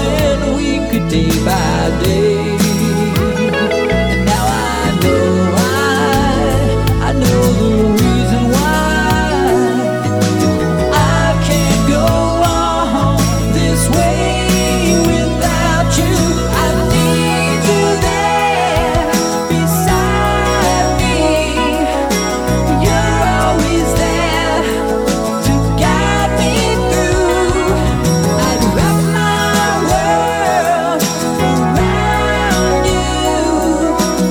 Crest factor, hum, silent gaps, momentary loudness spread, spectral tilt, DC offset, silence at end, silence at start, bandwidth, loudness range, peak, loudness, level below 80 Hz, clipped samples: 10 dB; none; none; 2 LU; -5 dB/octave; under 0.1%; 0 s; 0 s; 19 kHz; 1 LU; -2 dBFS; -13 LUFS; -22 dBFS; under 0.1%